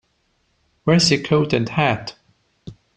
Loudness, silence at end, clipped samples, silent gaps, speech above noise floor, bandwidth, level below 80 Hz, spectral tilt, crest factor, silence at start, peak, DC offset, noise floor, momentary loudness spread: -18 LUFS; 0.25 s; under 0.1%; none; 48 dB; 10 kHz; -52 dBFS; -5 dB/octave; 18 dB; 0.85 s; -2 dBFS; under 0.1%; -66 dBFS; 12 LU